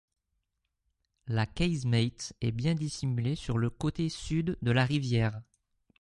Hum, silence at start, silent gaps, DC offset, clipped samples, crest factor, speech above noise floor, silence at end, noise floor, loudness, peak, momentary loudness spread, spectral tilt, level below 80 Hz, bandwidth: none; 1.25 s; none; under 0.1%; under 0.1%; 20 dB; 52 dB; 0.6 s; -82 dBFS; -31 LUFS; -12 dBFS; 6 LU; -6 dB/octave; -50 dBFS; 11.5 kHz